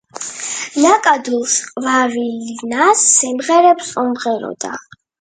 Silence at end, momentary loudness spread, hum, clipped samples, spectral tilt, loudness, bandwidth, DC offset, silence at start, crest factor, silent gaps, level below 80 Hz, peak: 0.4 s; 14 LU; none; under 0.1%; -1.5 dB/octave; -14 LUFS; 9.6 kHz; under 0.1%; 0.15 s; 16 dB; none; -66 dBFS; 0 dBFS